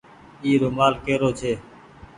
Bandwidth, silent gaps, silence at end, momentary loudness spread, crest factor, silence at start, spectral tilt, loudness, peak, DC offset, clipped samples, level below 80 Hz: 10.5 kHz; none; 0.15 s; 9 LU; 20 dB; 0.4 s; -6 dB/octave; -22 LUFS; -4 dBFS; under 0.1%; under 0.1%; -50 dBFS